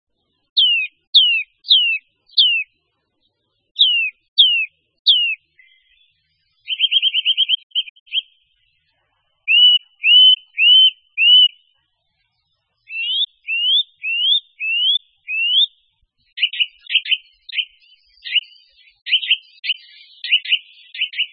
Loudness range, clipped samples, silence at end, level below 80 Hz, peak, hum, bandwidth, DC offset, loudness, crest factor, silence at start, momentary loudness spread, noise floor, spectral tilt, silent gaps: 9 LU; under 0.1%; 0.05 s; -78 dBFS; 0 dBFS; none; 5.2 kHz; under 0.1%; -14 LUFS; 18 dB; 0.55 s; 15 LU; -70 dBFS; 4 dB/octave; 1.07-1.13 s, 3.71-3.75 s, 4.28-4.36 s, 4.99-5.05 s, 7.63-7.70 s, 7.90-8.06 s